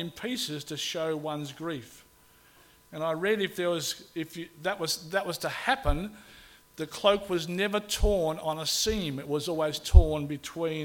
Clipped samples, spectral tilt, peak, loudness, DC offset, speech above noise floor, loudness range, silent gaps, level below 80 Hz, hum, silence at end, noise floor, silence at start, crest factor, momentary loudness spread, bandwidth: under 0.1%; -4.5 dB/octave; -2 dBFS; -29 LUFS; under 0.1%; 31 dB; 6 LU; none; -34 dBFS; none; 0 s; -59 dBFS; 0 s; 26 dB; 11 LU; 17.5 kHz